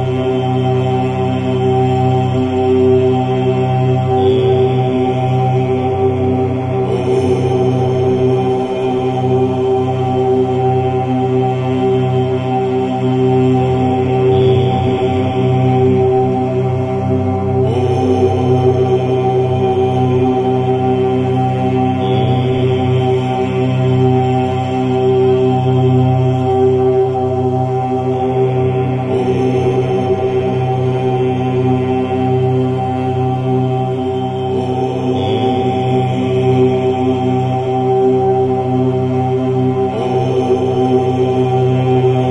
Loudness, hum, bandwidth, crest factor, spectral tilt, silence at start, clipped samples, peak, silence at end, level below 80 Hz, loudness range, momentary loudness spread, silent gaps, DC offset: -14 LUFS; none; 7.8 kHz; 12 dB; -9 dB/octave; 0 s; under 0.1%; 0 dBFS; 0 s; -44 dBFS; 2 LU; 4 LU; none; under 0.1%